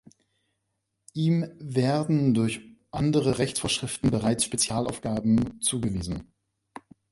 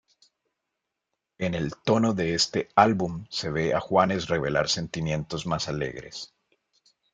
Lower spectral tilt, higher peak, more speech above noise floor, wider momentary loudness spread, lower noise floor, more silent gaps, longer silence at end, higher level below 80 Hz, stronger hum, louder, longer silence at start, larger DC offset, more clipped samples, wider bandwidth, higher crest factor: about the same, -5 dB/octave vs -4.5 dB/octave; second, -10 dBFS vs -4 dBFS; second, 54 dB vs 58 dB; second, 8 LU vs 11 LU; second, -79 dBFS vs -83 dBFS; neither; about the same, 0.9 s vs 0.85 s; about the same, -50 dBFS vs -54 dBFS; neither; about the same, -26 LUFS vs -26 LUFS; second, 1.15 s vs 1.4 s; neither; neither; first, 11.5 kHz vs 9.4 kHz; second, 16 dB vs 24 dB